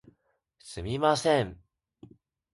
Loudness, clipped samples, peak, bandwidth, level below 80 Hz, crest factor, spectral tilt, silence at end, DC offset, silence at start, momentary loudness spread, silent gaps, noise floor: -27 LUFS; under 0.1%; -10 dBFS; 11.5 kHz; -54 dBFS; 22 dB; -5 dB/octave; 1 s; under 0.1%; 0.65 s; 15 LU; none; -72 dBFS